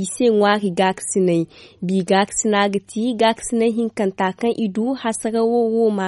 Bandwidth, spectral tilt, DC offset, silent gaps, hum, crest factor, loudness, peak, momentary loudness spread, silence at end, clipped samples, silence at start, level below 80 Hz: 11.5 kHz; -4.5 dB/octave; under 0.1%; none; none; 14 dB; -19 LUFS; -4 dBFS; 6 LU; 0 s; under 0.1%; 0 s; -58 dBFS